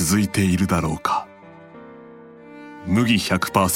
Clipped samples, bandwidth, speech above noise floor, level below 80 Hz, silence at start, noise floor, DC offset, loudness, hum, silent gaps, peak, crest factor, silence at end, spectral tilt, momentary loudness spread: under 0.1%; 17 kHz; 25 dB; -44 dBFS; 0 s; -44 dBFS; under 0.1%; -20 LUFS; none; none; 0 dBFS; 20 dB; 0 s; -4.5 dB/octave; 24 LU